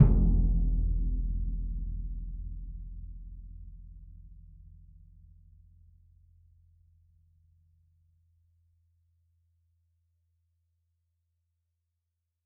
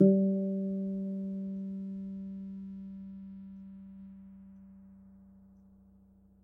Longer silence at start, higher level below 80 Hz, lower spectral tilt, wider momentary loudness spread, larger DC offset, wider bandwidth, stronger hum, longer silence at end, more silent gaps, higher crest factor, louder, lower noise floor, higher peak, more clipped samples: about the same, 0 s vs 0 s; first, -34 dBFS vs -68 dBFS; about the same, -12.5 dB/octave vs -13.5 dB/octave; first, 26 LU vs 23 LU; neither; second, 1.2 kHz vs 1.4 kHz; neither; first, 8.05 s vs 1.05 s; neither; about the same, 26 dB vs 24 dB; about the same, -33 LUFS vs -35 LUFS; first, -84 dBFS vs -61 dBFS; first, -6 dBFS vs -12 dBFS; neither